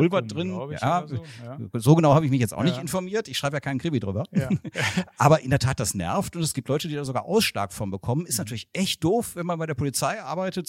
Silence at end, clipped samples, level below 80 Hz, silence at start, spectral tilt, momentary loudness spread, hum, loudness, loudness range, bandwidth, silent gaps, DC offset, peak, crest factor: 0.05 s; under 0.1%; -52 dBFS; 0 s; -5.5 dB/octave; 10 LU; none; -25 LUFS; 3 LU; 16.5 kHz; none; under 0.1%; -4 dBFS; 20 dB